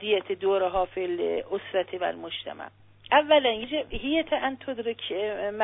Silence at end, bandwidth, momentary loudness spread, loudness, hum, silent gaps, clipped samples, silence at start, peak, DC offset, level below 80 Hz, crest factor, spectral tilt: 0 s; 4 kHz; 13 LU; -27 LUFS; none; none; under 0.1%; 0 s; -6 dBFS; under 0.1%; -54 dBFS; 20 dB; -8 dB/octave